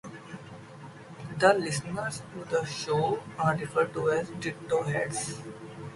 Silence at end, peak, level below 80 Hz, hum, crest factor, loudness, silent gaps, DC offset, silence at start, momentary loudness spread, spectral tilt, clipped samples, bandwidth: 0 s; -6 dBFS; -62 dBFS; none; 24 dB; -29 LUFS; none; under 0.1%; 0.05 s; 20 LU; -4.5 dB/octave; under 0.1%; 11.5 kHz